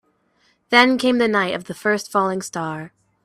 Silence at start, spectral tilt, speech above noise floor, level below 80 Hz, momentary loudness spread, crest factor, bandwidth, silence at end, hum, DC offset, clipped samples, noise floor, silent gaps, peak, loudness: 0.7 s; -4 dB/octave; 44 dB; -64 dBFS; 13 LU; 20 dB; 14 kHz; 0.35 s; none; under 0.1%; under 0.1%; -63 dBFS; none; 0 dBFS; -19 LUFS